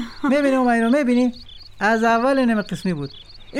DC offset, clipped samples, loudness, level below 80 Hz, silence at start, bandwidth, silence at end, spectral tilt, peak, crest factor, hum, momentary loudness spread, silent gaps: under 0.1%; under 0.1%; -19 LUFS; -48 dBFS; 0 s; 12 kHz; 0 s; -6 dB/octave; -8 dBFS; 12 dB; none; 9 LU; none